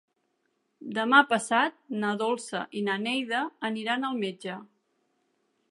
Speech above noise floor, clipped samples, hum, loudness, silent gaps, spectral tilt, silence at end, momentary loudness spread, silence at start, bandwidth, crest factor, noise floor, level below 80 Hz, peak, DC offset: 48 dB; under 0.1%; none; -27 LUFS; none; -3.5 dB/octave; 1.05 s; 14 LU; 0.8 s; 11.5 kHz; 24 dB; -75 dBFS; -84 dBFS; -6 dBFS; under 0.1%